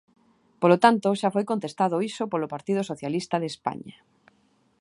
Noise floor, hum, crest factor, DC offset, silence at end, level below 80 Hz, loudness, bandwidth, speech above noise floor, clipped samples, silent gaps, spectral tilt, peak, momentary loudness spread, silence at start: -65 dBFS; none; 24 dB; under 0.1%; 0.9 s; -70 dBFS; -25 LUFS; 11.5 kHz; 41 dB; under 0.1%; none; -6 dB/octave; -2 dBFS; 12 LU; 0.6 s